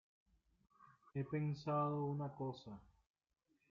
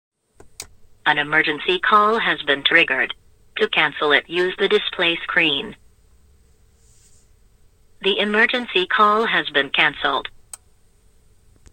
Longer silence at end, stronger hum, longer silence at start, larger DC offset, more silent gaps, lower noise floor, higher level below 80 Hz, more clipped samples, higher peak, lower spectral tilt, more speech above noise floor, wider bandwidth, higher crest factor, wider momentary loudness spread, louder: second, 0.9 s vs 1.45 s; neither; first, 0.8 s vs 0.45 s; neither; neither; first, -84 dBFS vs -55 dBFS; second, -78 dBFS vs -56 dBFS; neither; second, -30 dBFS vs -2 dBFS; first, -8 dB/octave vs -3.5 dB/octave; first, 42 dB vs 36 dB; second, 7 kHz vs 16.5 kHz; about the same, 16 dB vs 20 dB; first, 15 LU vs 12 LU; second, -43 LUFS vs -18 LUFS